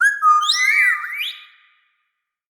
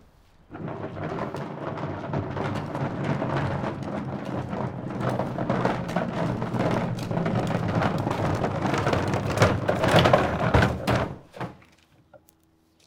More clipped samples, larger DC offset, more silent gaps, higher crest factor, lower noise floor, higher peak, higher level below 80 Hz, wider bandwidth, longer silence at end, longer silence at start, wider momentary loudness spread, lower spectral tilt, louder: neither; neither; neither; second, 14 dB vs 26 dB; first, -75 dBFS vs -63 dBFS; about the same, -4 dBFS vs -2 dBFS; second, under -90 dBFS vs -46 dBFS; first, over 20 kHz vs 17 kHz; first, 1.1 s vs 0.7 s; second, 0 s vs 0.5 s; about the same, 12 LU vs 12 LU; second, 6.5 dB/octave vs -6.5 dB/octave; first, -15 LUFS vs -26 LUFS